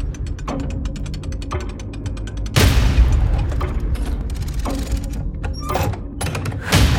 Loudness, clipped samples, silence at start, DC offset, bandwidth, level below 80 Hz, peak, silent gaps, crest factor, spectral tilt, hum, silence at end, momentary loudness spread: -22 LUFS; under 0.1%; 0 s; under 0.1%; 17.5 kHz; -22 dBFS; -2 dBFS; none; 18 dB; -5 dB/octave; none; 0 s; 12 LU